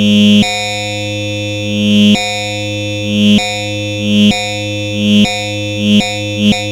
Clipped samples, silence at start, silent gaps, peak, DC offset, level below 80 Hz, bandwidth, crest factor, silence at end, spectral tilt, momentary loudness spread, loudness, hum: under 0.1%; 0 s; none; 0 dBFS; under 0.1%; -42 dBFS; 15 kHz; 12 dB; 0 s; -4.5 dB/octave; 9 LU; -12 LUFS; none